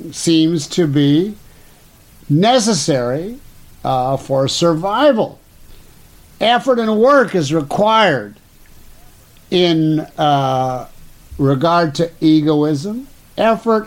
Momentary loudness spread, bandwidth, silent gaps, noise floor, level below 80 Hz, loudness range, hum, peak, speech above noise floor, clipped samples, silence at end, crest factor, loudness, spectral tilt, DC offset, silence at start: 10 LU; 16.5 kHz; none; -45 dBFS; -46 dBFS; 3 LU; none; -2 dBFS; 31 dB; under 0.1%; 0 s; 14 dB; -15 LUFS; -5.5 dB/octave; under 0.1%; 0 s